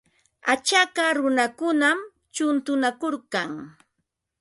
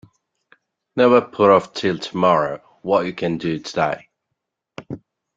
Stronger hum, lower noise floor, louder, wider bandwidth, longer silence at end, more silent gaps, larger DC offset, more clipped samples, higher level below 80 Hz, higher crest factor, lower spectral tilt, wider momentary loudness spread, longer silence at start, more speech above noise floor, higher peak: neither; about the same, -78 dBFS vs -79 dBFS; second, -23 LUFS vs -19 LUFS; first, 11.5 kHz vs 7.8 kHz; first, 0.7 s vs 0.4 s; neither; neither; neither; second, -72 dBFS vs -60 dBFS; about the same, 18 dB vs 20 dB; second, -2 dB/octave vs -6 dB/octave; second, 10 LU vs 18 LU; second, 0.45 s vs 0.95 s; second, 55 dB vs 61 dB; second, -6 dBFS vs -2 dBFS